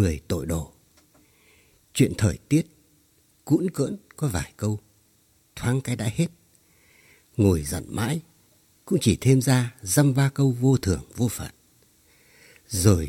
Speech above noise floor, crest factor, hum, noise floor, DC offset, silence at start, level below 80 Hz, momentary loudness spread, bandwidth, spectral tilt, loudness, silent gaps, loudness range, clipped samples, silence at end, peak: 40 dB; 22 dB; none; -62 dBFS; under 0.1%; 0 s; -46 dBFS; 11 LU; 16.5 kHz; -6 dB/octave; -24 LUFS; none; 6 LU; under 0.1%; 0 s; -2 dBFS